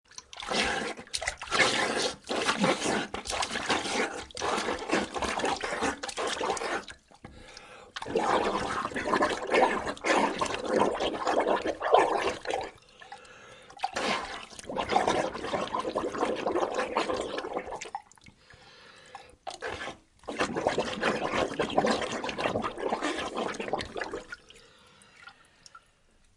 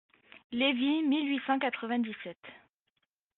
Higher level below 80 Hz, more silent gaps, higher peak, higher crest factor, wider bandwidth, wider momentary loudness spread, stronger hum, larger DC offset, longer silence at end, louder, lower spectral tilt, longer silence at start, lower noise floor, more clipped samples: first, -56 dBFS vs -78 dBFS; second, none vs 0.44-0.50 s; first, -6 dBFS vs -16 dBFS; first, 24 dB vs 16 dB; first, 11.5 kHz vs 4.2 kHz; about the same, 17 LU vs 15 LU; neither; neither; second, 0.6 s vs 0.8 s; about the same, -30 LUFS vs -30 LUFS; first, -3 dB/octave vs -1 dB/octave; second, 0.2 s vs 0.35 s; second, -63 dBFS vs -81 dBFS; neither